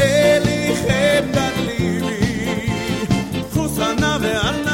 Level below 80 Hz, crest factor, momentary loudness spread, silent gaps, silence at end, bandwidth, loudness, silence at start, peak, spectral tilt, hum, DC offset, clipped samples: -36 dBFS; 16 dB; 6 LU; none; 0 s; 16.5 kHz; -18 LUFS; 0 s; -2 dBFS; -5 dB/octave; none; 0.1%; under 0.1%